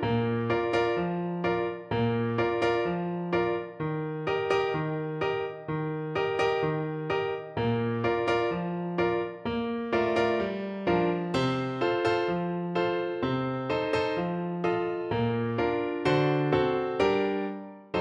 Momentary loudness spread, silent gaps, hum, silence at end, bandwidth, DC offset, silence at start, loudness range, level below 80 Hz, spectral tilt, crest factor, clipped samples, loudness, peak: 6 LU; none; none; 0 s; 9.2 kHz; under 0.1%; 0 s; 2 LU; -56 dBFS; -7.5 dB/octave; 16 dB; under 0.1%; -28 LUFS; -12 dBFS